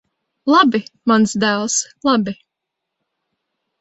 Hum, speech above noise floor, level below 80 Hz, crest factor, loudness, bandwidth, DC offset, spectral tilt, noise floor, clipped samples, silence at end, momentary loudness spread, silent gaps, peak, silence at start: none; 64 dB; -60 dBFS; 18 dB; -16 LUFS; 8.2 kHz; under 0.1%; -3.5 dB/octave; -80 dBFS; under 0.1%; 1.5 s; 12 LU; none; 0 dBFS; 0.45 s